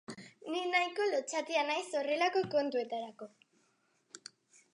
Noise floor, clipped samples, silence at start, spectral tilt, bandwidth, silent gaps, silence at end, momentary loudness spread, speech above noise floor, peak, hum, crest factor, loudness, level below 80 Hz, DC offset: -75 dBFS; under 0.1%; 0.1 s; -3 dB/octave; 11 kHz; none; 0.55 s; 20 LU; 41 dB; -16 dBFS; none; 18 dB; -33 LUFS; -86 dBFS; under 0.1%